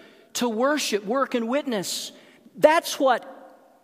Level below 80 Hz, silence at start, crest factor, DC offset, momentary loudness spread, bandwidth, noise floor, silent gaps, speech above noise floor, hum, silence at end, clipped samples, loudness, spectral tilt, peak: -78 dBFS; 0.35 s; 22 dB; under 0.1%; 12 LU; 15.5 kHz; -49 dBFS; none; 26 dB; none; 0.35 s; under 0.1%; -24 LUFS; -3 dB/octave; -2 dBFS